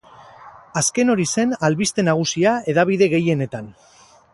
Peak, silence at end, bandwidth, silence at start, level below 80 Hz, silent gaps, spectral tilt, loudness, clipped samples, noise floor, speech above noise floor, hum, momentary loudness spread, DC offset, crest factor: -2 dBFS; 0.6 s; 11.5 kHz; 0.2 s; -58 dBFS; none; -4.5 dB/octave; -19 LUFS; under 0.1%; -43 dBFS; 25 dB; none; 10 LU; under 0.1%; 16 dB